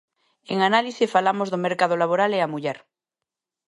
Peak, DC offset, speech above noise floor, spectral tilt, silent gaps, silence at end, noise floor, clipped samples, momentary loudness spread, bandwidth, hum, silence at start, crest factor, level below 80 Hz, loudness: -6 dBFS; under 0.1%; 65 dB; -5 dB/octave; none; 0.9 s; -87 dBFS; under 0.1%; 9 LU; 11.5 kHz; none; 0.5 s; 18 dB; -78 dBFS; -22 LUFS